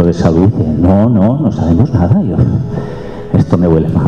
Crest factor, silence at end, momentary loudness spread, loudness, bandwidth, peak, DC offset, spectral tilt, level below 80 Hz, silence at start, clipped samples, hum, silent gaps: 10 dB; 0 s; 8 LU; -11 LUFS; 7.2 kHz; 0 dBFS; 1%; -10 dB/octave; -28 dBFS; 0 s; under 0.1%; none; none